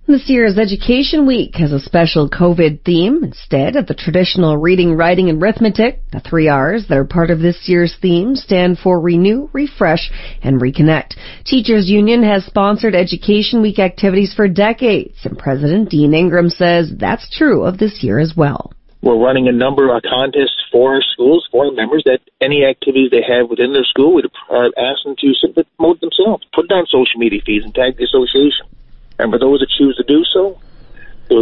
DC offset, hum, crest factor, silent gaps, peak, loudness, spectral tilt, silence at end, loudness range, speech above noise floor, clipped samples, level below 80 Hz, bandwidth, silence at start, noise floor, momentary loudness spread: under 0.1%; none; 12 dB; none; 0 dBFS; -13 LUFS; -9.5 dB/octave; 0 s; 1 LU; 20 dB; under 0.1%; -34 dBFS; 6 kHz; 0.1 s; -32 dBFS; 6 LU